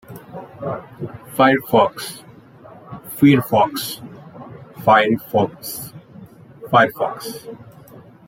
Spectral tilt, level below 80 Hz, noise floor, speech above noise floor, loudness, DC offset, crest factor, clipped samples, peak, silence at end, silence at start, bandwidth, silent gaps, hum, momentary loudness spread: -5.5 dB/octave; -58 dBFS; -43 dBFS; 26 dB; -18 LUFS; under 0.1%; 20 dB; under 0.1%; -2 dBFS; 0.3 s; 0.1 s; 16.5 kHz; none; none; 24 LU